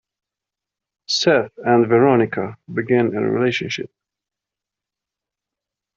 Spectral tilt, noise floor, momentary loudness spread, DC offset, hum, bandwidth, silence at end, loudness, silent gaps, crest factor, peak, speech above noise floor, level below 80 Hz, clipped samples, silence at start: -4 dB/octave; -87 dBFS; 13 LU; under 0.1%; none; 7.8 kHz; 2.1 s; -18 LUFS; none; 18 dB; -2 dBFS; 69 dB; -62 dBFS; under 0.1%; 1.1 s